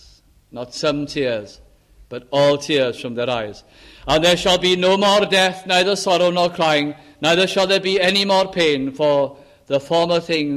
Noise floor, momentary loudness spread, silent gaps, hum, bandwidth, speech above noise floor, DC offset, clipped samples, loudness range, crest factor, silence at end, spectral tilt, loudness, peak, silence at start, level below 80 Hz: -50 dBFS; 11 LU; none; none; 14.5 kHz; 32 dB; under 0.1%; under 0.1%; 5 LU; 14 dB; 0 s; -4 dB/octave; -17 LUFS; -4 dBFS; 0.55 s; -48 dBFS